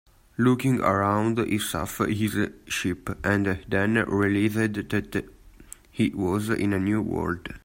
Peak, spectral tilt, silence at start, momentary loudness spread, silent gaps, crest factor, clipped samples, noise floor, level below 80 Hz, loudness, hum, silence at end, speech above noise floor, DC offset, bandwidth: -8 dBFS; -6 dB/octave; 0.4 s; 7 LU; none; 18 dB; under 0.1%; -48 dBFS; -50 dBFS; -25 LUFS; none; 0.05 s; 23 dB; under 0.1%; 16.5 kHz